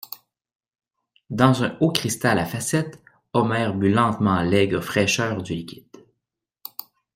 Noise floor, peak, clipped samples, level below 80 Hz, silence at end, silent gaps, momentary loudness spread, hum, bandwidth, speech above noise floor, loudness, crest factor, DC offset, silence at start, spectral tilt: -83 dBFS; 0 dBFS; under 0.1%; -56 dBFS; 0.35 s; none; 17 LU; none; 16.5 kHz; 62 dB; -21 LUFS; 22 dB; under 0.1%; 0.1 s; -5 dB/octave